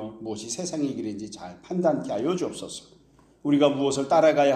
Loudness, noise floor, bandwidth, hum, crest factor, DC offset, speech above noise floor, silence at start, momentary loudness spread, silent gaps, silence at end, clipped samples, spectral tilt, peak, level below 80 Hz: -25 LUFS; -56 dBFS; 12 kHz; none; 20 dB; under 0.1%; 32 dB; 0 s; 17 LU; none; 0 s; under 0.1%; -5 dB/octave; -6 dBFS; -64 dBFS